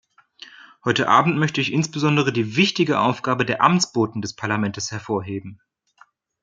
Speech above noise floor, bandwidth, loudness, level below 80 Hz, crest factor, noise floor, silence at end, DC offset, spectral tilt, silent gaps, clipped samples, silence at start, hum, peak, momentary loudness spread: 36 dB; 9.4 kHz; -20 LUFS; -62 dBFS; 20 dB; -56 dBFS; 0.9 s; under 0.1%; -5 dB/octave; none; under 0.1%; 0.85 s; none; -2 dBFS; 10 LU